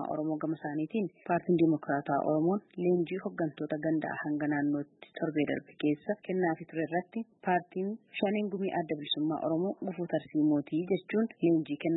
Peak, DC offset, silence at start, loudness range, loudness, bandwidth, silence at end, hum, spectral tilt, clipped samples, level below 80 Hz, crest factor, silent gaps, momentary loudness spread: -16 dBFS; under 0.1%; 0 s; 3 LU; -32 LUFS; 4.1 kHz; 0 s; none; -10.5 dB/octave; under 0.1%; -76 dBFS; 16 dB; none; 7 LU